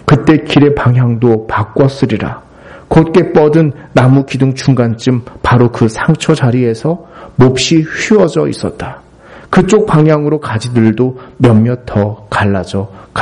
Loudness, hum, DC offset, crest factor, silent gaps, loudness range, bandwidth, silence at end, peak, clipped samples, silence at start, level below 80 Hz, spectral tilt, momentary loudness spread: -11 LUFS; none; under 0.1%; 10 dB; none; 2 LU; 11 kHz; 0 s; 0 dBFS; 0.1%; 0.05 s; -36 dBFS; -7 dB/octave; 9 LU